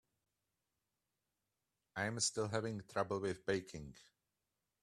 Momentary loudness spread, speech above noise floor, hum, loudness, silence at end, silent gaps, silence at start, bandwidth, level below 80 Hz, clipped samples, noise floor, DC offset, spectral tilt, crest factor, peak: 15 LU; 49 dB; none; -40 LUFS; 0.8 s; none; 1.95 s; 13.5 kHz; -72 dBFS; under 0.1%; -89 dBFS; under 0.1%; -3.5 dB/octave; 24 dB; -20 dBFS